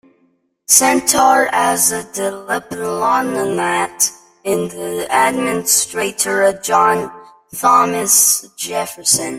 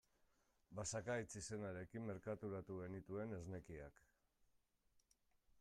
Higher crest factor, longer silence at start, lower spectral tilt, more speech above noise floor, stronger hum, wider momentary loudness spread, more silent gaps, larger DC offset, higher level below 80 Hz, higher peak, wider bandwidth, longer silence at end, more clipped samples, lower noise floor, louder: about the same, 16 dB vs 18 dB; about the same, 0.7 s vs 0.7 s; second, -1.5 dB/octave vs -5 dB/octave; first, 45 dB vs 33 dB; neither; about the same, 12 LU vs 10 LU; neither; neither; first, -56 dBFS vs -74 dBFS; first, 0 dBFS vs -34 dBFS; first, 16.5 kHz vs 13.5 kHz; about the same, 0 s vs 0 s; neither; second, -60 dBFS vs -82 dBFS; first, -14 LUFS vs -50 LUFS